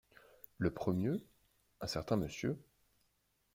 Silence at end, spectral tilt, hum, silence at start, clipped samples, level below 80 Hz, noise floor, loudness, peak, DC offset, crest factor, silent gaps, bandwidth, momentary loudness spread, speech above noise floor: 0.95 s; -6.5 dB/octave; none; 0.6 s; under 0.1%; -62 dBFS; -78 dBFS; -39 LUFS; -18 dBFS; under 0.1%; 22 dB; none; 16.5 kHz; 12 LU; 42 dB